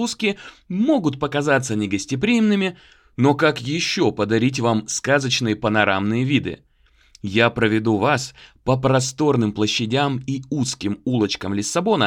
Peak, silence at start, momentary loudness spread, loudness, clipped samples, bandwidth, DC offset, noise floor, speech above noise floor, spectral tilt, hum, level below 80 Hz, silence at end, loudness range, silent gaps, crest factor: -2 dBFS; 0 s; 7 LU; -20 LUFS; under 0.1%; 14 kHz; under 0.1%; -54 dBFS; 34 dB; -5 dB/octave; none; -52 dBFS; 0 s; 2 LU; none; 18 dB